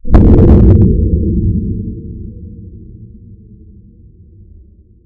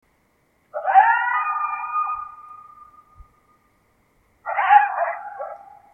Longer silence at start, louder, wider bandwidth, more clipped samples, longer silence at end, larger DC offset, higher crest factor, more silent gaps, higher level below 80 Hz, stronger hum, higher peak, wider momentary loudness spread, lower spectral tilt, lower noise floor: second, 0.05 s vs 0.75 s; first, -10 LUFS vs -20 LUFS; about the same, 3.4 kHz vs 3.3 kHz; first, 3% vs under 0.1%; first, 2 s vs 0.3 s; neither; second, 12 dB vs 22 dB; neither; first, -16 dBFS vs -62 dBFS; neither; about the same, 0 dBFS vs 0 dBFS; first, 25 LU vs 22 LU; first, -12 dB/octave vs -3 dB/octave; second, -41 dBFS vs -64 dBFS